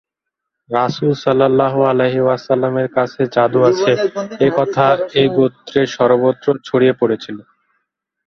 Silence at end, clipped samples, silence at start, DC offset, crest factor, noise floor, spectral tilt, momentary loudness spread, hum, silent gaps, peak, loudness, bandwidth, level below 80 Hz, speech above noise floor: 0.85 s; under 0.1%; 0.7 s; under 0.1%; 14 dB; -80 dBFS; -6.5 dB/octave; 5 LU; none; none; 0 dBFS; -15 LUFS; 6.6 kHz; -56 dBFS; 66 dB